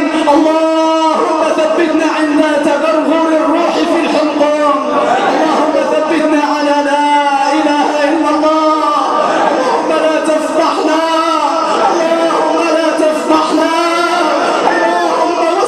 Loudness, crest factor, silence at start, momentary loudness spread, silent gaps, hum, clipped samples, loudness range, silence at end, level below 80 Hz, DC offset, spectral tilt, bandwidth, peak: -11 LUFS; 10 dB; 0 s; 2 LU; none; none; under 0.1%; 1 LU; 0 s; -56 dBFS; under 0.1%; -3.5 dB/octave; 12.5 kHz; 0 dBFS